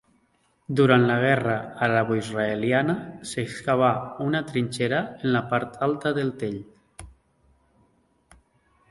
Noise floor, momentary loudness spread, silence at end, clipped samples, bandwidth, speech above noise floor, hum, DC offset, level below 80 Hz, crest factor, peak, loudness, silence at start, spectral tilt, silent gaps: -67 dBFS; 11 LU; 1.8 s; under 0.1%; 11.5 kHz; 43 dB; none; under 0.1%; -58 dBFS; 22 dB; -4 dBFS; -24 LUFS; 0.7 s; -6.5 dB/octave; none